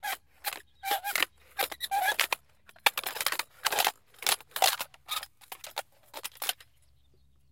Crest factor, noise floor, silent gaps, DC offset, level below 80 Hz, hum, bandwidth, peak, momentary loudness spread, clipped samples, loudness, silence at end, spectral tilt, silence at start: 32 dB; -66 dBFS; none; under 0.1%; -72 dBFS; none; 17 kHz; -2 dBFS; 14 LU; under 0.1%; -31 LUFS; 0.95 s; 1.5 dB/octave; 0.05 s